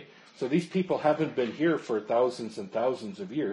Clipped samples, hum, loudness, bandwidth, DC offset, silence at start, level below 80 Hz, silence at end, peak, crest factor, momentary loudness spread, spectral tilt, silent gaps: under 0.1%; none; -29 LUFS; 11.5 kHz; under 0.1%; 0 s; -74 dBFS; 0 s; -12 dBFS; 18 dB; 9 LU; -7 dB/octave; none